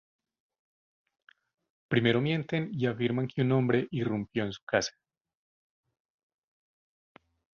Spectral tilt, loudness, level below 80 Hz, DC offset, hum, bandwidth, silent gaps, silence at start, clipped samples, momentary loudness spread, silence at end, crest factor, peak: -6 dB/octave; -30 LUFS; -66 dBFS; under 0.1%; none; 7.2 kHz; 4.62-4.67 s; 1.9 s; under 0.1%; 7 LU; 2.7 s; 22 dB; -10 dBFS